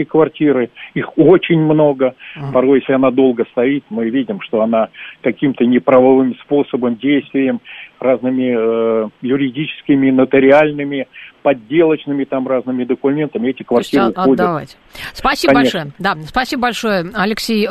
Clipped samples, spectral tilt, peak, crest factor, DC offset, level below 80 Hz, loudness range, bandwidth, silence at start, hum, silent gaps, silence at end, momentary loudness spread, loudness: under 0.1%; -6.5 dB/octave; 0 dBFS; 14 dB; under 0.1%; -46 dBFS; 3 LU; 13.5 kHz; 0 s; none; none; 0 s; 10 LU; -15 LUFS